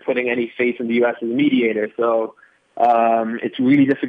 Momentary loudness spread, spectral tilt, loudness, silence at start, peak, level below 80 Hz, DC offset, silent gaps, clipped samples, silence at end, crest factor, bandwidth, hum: 6 LU; -8.5 dB/octave; -18 LUFS; 0.05 s; -4 dBFS; -70 dBFS; under 0.1%; none; under 0.1%; 0 s; 14 dB; 4.7 kHz; none